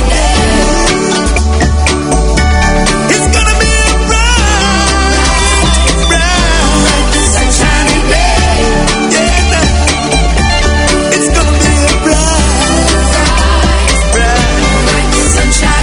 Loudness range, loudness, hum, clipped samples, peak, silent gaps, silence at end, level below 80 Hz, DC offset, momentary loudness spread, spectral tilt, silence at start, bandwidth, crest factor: 1 LU; -9 LUFS; none; 0.3%; 0 dBFS; none; 0 s; -12 dBFS; under 0.1%; 2 LU; -3.5 dB/octave; 0 s; 11 kHz; 8 dB